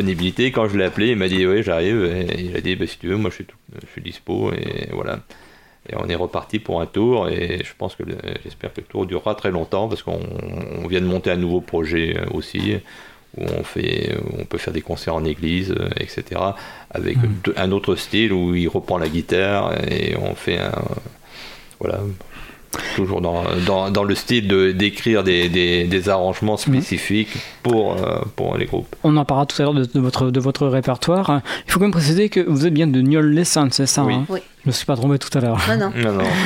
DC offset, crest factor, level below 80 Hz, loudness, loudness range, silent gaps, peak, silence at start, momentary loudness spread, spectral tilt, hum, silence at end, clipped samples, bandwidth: under 0.1%; 18 dB; -42 dBFS; -20 LUFS; 8 LU; none; -2 dBFS; 0 s; 12 LU; -5.5 dB/octave; none; 0 s; under 0.1%; 16.5 kHz